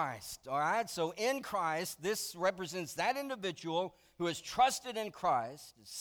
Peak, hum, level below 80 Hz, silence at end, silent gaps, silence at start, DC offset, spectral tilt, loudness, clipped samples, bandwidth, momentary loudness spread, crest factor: -18 dBFS; none; -70 dBFS; 0 s; none; 0 s; under 0.1%; -3 dB/octave; -35 LUFS; under 0.1%; over 20 kHz; 10 LU; 18 dB